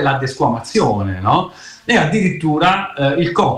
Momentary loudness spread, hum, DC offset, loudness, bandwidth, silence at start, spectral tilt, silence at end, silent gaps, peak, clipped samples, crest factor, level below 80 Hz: 4 LU; none; under 0.1%; -16 LUFS; 11.5 kHz; 0 s; -6 dB/octave; 0 s; none; -4 dBFS; under 0.1%; 12 dB; -46 dBFS